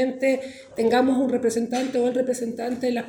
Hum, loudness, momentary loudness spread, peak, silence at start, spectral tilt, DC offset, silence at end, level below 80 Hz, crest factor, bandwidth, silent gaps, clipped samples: none; -23 LUFS; 8 LU; -10 dBFS; 0 s; -4.5 dB/octave; under 0.1%; 0 s; -64 dBFS; 14 dB; 18.5 kHz; none; under 0.1%